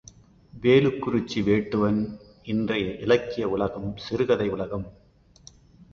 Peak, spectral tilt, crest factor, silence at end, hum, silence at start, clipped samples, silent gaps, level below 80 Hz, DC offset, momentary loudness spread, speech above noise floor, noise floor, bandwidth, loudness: -6 dBFS; -7 dB/octave; 20 dB; 1 s; none; 0.55 s; under 0.1%; none; -52 dBFS; under 0.1%; 13 LU; 29 dB; -53 dBFS; 7.2 kHz; -25 LUFS